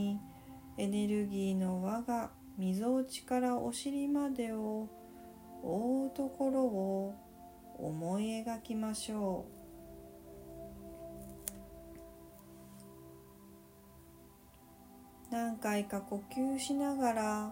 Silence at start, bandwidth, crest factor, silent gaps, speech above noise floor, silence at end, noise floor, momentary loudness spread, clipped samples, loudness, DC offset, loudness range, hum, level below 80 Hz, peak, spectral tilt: 0 s; 16 kHz; 26 dB; none; 24 dB; 0 s; -59 dBFS; 22 LU; under 0.1%; -37 LUFS; under 0.1%; 15 LU; none; -64 dBFS; -12 dBFS; -5.5 dB/octave